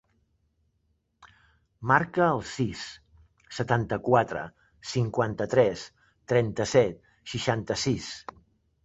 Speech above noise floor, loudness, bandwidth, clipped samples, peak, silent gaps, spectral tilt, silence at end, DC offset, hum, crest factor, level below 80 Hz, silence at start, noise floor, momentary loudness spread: 47 dB; -27 LUFS; 8.2 kHz; under 0.1%; -6 dBFS; none; -5.5 dB/octave; 0.65 s; under 0.1%; none; 22 dB; -56 dBFS; 1.25 s; -73 dBFS; 17 LU